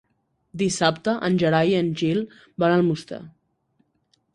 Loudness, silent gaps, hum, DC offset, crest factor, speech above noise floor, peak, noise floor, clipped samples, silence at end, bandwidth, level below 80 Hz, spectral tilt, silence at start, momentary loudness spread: -22 LUFS; none; none; under 0.1%; 20 dB; 49 dB; -4 dBFS; -70 dBFS; under 0.1%; 1.05 s; 11 kHz; -60 dBFS; -5.5 dB/octave; 0.55 s; 16 LU